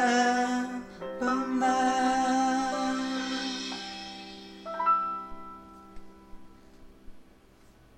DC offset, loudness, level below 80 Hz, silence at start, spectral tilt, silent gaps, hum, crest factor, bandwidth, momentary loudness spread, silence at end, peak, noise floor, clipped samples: under 0.1%; -29 LUFS; -58 dBFS; 0 s; -3 dB/octave; none; none; 18 dB; 11.5 kHz; 18 LU; 0.75 s; -12 dBFS; -57 dBFS; under 0.1%